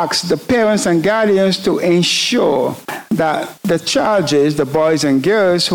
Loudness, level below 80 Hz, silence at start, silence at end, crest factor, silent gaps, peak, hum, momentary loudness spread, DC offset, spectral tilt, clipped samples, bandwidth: -14 LUFS; -52 dBFS; 0 s; 0 s; 10 dB; none; -4 dBFS; none; 5 LU; under 0.1%; -4.5 dB/octave; under 0.1%; 19.5 kHz